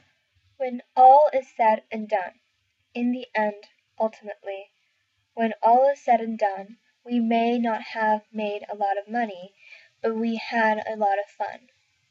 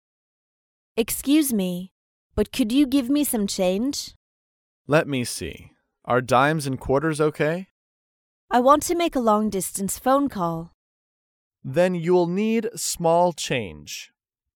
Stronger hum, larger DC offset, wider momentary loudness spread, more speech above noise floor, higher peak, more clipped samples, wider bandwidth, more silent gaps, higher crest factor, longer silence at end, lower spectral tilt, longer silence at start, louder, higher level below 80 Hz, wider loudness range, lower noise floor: neither; neither; first, 16 LU vs 13 LU; second, 49 dB vs over 68 dB; about the same, -4 dBFS vs -4 dBFS; neither; second, 7.4 kHz vs 18 kHz; second, none vs 1.91-2.30 s, 4.16-4.85 s, 7.71-8.48 s, 10.74-11.51 s; about the same, 20 dB vs 20 dB; about the same, 0.55 s vs 0.5 s; about the same, -6 dB/octave vs -5 dB/octave; second, 0.6 s vs 0.95 s; about the same, -23 LUFS vs -22 LUFS; second, -84 dBFS vs -50 dBFS; first, 7 LU vs 2 LU; second, -72 dBFS vs under -90 dBFS